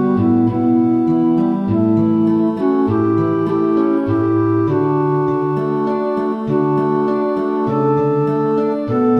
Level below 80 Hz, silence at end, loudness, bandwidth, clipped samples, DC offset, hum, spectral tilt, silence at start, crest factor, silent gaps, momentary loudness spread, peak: -52 dBFS; 0 s; -16 LUFS; 5.6 kHz; under 0.1%; under 0.1%; none; -10.5 dB/octave; 0 s; 12 dB; none; 4 LU; -4 dBFS